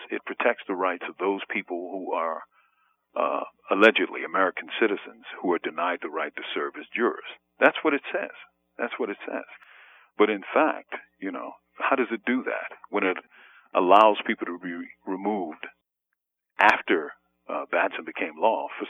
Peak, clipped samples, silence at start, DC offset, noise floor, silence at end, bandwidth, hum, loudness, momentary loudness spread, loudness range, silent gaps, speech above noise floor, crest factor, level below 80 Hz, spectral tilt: -2 dBFS; under 0.1%; 0 s; under 0.1%; -83 dBFS; 0 s; 9.2 kHz; none; -26 LUFS; 16 LU; 5 LU; none; 57 dB; 24 dB; -80 dBFS; -5.5 dB/octave